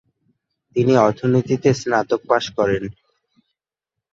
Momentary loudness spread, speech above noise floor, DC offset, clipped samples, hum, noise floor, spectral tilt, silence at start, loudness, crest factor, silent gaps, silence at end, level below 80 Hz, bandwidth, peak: 8 LU; 67 dB; under 0.1%; under 0.1%; none; -85 dBFS; -6.5 dB/octave; 0.75 s; -19 LUFS; 18 dB; none; 1.25 s; -54 dBFS; 7.8 kHz; -2 dBFS